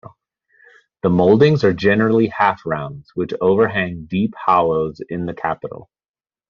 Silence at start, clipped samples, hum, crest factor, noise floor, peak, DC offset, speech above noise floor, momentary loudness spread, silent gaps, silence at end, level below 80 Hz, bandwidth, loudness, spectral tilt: 0.05 s; under 0.1%; none; 16 dB; under -90 dBFS; -2 dBFS; under 0.1%; over 73 dB; 13 LU; none; 0.65 s; -52 dBFS; 7 kHz; -17 LUFS; -6 dB/octave